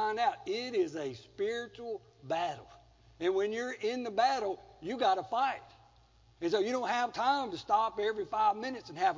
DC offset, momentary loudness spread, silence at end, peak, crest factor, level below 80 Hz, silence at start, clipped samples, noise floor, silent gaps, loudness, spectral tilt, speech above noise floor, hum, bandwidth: under 0.1%; 11 LU; 0 s; -16 dBFS; 16 dB; -68 dBFS; 0 s; under 0.1%; -63 dBFS; none; -33 LUFS; -4 dB/octave; 31 dB; none; 7.6 kHz